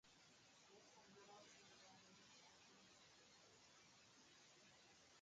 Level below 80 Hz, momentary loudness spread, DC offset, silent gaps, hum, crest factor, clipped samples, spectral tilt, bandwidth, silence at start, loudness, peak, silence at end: under -90 dBFS; 3 LU; under 0.1%; none; none; 16 dB; under 0.1%; -2 dB/octave; 9 kHz; 0.05 s; -68 LUFS; -54 dBFS; 0 s